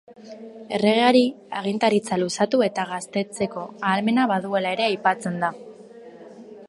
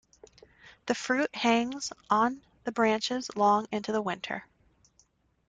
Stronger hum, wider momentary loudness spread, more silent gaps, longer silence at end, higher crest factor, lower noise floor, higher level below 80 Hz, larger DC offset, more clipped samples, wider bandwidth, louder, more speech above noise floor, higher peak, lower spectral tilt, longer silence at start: neither; first, 16 LU vs 12 LU; neither; second, 0 s vs 1.05 s; about the same, 18 dB vs 20 dB; second, -44 dBFS vs -68 dBFS; about the same, -68 dBFS vs -68 dBFS; neither; neither; first, 11.5 kHz vs 9.4 kHz; first, -22 LUFS vs -29 LUFS; second, 21 dB vs 40 dB; first, -4 dBFS vs -12 dBFS; first, -5 dB/octave vs -3.5 dB/octave; second, 0.1 s vs 0.65 s